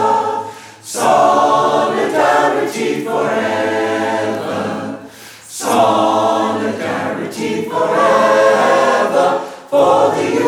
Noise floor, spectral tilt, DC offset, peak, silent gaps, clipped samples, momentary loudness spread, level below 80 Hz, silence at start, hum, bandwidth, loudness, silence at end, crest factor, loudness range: -36 dBFS; -4 dB/octave; under 0.1%; -2 dBFS; none; under 0.1%; 12 LU; -62 dBFS; 0 s; none; 16.5 kHz; -14 LUFS; 0 s; 14 dB; 4 LU